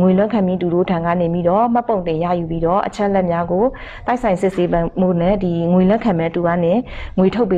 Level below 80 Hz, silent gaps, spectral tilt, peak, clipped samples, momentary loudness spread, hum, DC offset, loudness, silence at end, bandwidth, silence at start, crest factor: -36 dBFS; none; -8.5 dB/octave; -4 dBFS; under 0.1%; 5 LU; none; under 0.1%; -17 LUFS; 0 s; 9 kHz; 0 s; 12 dB